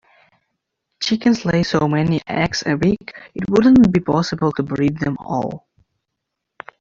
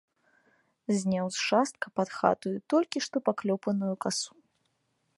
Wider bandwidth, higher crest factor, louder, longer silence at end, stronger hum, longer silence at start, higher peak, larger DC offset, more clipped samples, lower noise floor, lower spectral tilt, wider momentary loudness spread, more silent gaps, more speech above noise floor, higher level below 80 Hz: second, 7.6 kHz vs 11.5 kHz; second, 16 dB vs 24 dB; first, -18 LUFS vs -29 LUFS; first, 1.2 s vs 0.9 s; neither; about the same, 1 s vs 0.9 s; first, -2 dBFS vs -8 dBFS; neither; neither; about the same, -78 dBFS vs -76 dBFS; first, -6.5 dB/octave vs -4.5 dB/octave; first, 13 LU vs 6 LU; neither; first, 62 dB vs 47 dB; first, -46 dBFS vs -74 dBFS